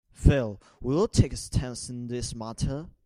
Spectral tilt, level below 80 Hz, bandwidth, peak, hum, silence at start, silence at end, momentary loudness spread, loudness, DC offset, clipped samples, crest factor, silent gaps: -6 dB/octave; -34 dBFS; 13 kHz; -4 dBFS; none; 0.2 s; 0.15 s; 12 LU; -28 LUFS; under 0.1%; under 0.1%; 22 dB; none